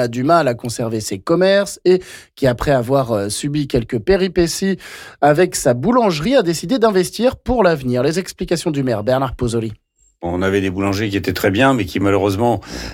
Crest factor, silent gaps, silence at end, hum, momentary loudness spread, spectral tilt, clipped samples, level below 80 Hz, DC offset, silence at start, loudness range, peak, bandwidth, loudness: 12 dB; none; 0 s; none; 7 LU; -5.5 dB/octave; under 0.1%; -38 dBFS; under 0.1%; 0 s; 3 LU; -4 dBFS; 17 kHz; -17 LUFS